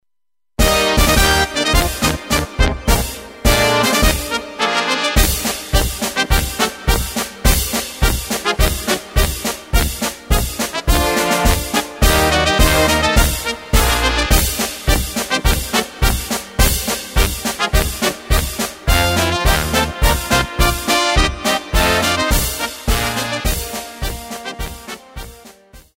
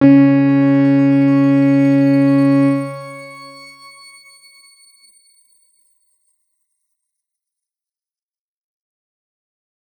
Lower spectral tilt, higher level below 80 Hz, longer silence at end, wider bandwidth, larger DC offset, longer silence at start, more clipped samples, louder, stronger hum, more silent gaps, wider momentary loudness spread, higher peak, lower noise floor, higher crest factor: second, -3.5 dB/octave vs -9 dB/octave; first, -20 dBFS vs -68 dBFS; second, 0.2 s vs 6.5 s; first, 16.5 kHz vs 9.4 kHz; neither; first, 0.6 s vs 0 s; neither; second, -16 LUFS vs -12 LUFS; neither; neither; second, 9 LU vs 21 LU; about the same, 0 dBFS vs -2 dBFS; about the same, under -90 dBFS vs under -90 dBFS; about the same, 16 dB vs 16 dB